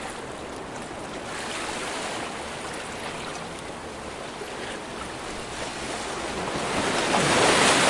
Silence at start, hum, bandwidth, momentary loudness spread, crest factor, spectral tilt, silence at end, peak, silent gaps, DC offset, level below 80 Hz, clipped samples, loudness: 0 s; none; 12 kHz; 15 LU; 22 dB; -2.5 dB/octave; 0 s; -4 dBFS; none; under 0.1%; -50 dBFS; under 0.1%; -28 LUFS